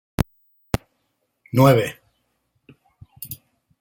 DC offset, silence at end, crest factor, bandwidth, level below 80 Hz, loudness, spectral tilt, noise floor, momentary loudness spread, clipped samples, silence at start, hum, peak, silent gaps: under 0.1%; 0.45 s; 22 dB; 16.5 kHz; -44 dBFS; -21 LUFS; -6.5 dB/octave; -72 dBFS; 21 LU; under 0.1%; 0.2 s; none; -2 dBFS; none